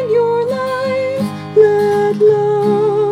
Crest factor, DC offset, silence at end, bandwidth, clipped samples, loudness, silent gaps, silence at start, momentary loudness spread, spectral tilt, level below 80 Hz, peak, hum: 12 dB; under 0.1%; 0 s; 11.5 kHz; under 0.1%; -14 LUFS; none; 0 s; 6 LU; -7 dB/octave; -64 dBFS; 0 dBFS; none